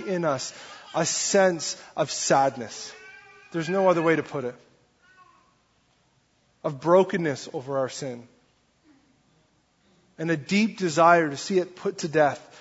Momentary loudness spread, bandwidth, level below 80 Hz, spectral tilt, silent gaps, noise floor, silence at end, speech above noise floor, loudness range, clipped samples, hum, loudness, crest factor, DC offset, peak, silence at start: 15 LU; 8 kHz; -70 dBFS; -4 dB/octave; none; -66 dBFS; 0.15 s; 42 dB; 6 LU; under 0.1%; none; -24 LUFS; 22 dB; under 0.1%; -4 dBFS; 0 s